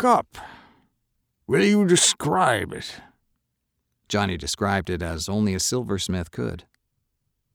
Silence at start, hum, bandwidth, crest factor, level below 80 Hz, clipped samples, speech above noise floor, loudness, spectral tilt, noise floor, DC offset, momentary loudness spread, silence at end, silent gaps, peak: 0 s; none; over 20 kHz; 20 dB; -52 dBFS; under 0.1%; 54 dB; -22 LUFS; -4 dB/octave; -77 dBFS; under 0.1%; 18 LU; 0.95 s; none; -6 dBFS